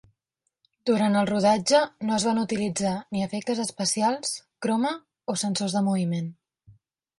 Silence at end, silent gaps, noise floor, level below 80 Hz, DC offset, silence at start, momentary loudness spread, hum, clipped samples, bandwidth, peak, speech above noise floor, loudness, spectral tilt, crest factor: 0.5 s; none; -80 dBFS; -66 dBFS; under 0.1%; 0.85 s; 9 LU; none; under 0.1%; 11.5 kHz; -8 dBFS; 55 dB; -25 LUFS; -4.5 dB/octave; 18 dB